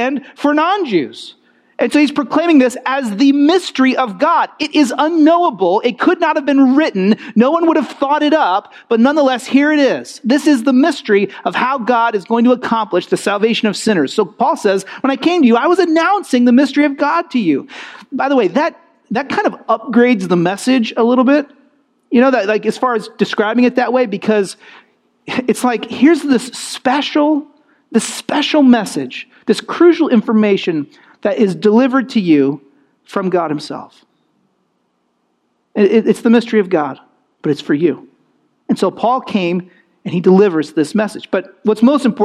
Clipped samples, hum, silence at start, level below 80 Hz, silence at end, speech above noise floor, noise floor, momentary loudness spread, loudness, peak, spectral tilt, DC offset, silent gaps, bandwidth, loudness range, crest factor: under 0.1%; none; 0 s; -66 dBFS; 0 s; 51 dB; -64 dBFS; 10 LU; -14 LUFS; 0 dBFS; -5.5 dB/octave; under 0.1%; none; 13 kHz; 4 LU; 14 dB